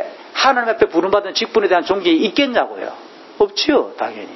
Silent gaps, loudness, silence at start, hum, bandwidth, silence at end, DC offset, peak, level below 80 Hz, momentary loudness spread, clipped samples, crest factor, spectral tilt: none; -16 LUFS; 0 s; none; 6.2 kHz; 0 s; under 0.1%; 0 dBFS; -54 dBFS; 11 LU; under 0.1%; 18 dB; -3.5 dB/octave